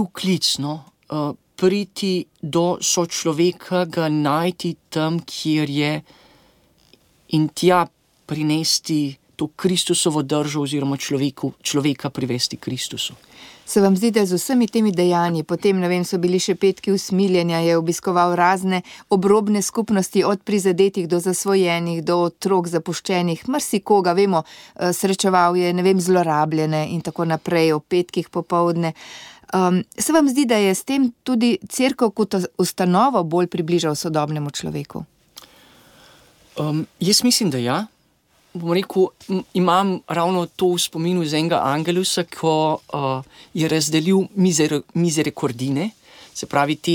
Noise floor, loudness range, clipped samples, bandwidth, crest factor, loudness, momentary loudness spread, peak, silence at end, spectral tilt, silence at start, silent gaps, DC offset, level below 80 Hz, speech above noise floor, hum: -60 dBFS; 4 LU; under 0.1%; 17.5 kHz; 16 dB; -20 LUFS; 9 LU; -4 dBFS; 0 s; -4.5 dB/octave; 0 s; none; under 0.1%; -62 dBFS; 41 dB; none